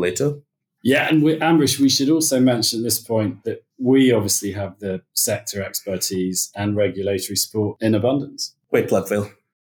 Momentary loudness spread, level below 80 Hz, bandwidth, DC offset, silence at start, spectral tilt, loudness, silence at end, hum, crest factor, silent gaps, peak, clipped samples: 11 LU; -62 dBFS; 19 kHz; under 0.1%; 0 s; -4 dB/octave; -20 LUFS; 0.4 s; none; 16 dB; none; -4 dBFS; under 0.1%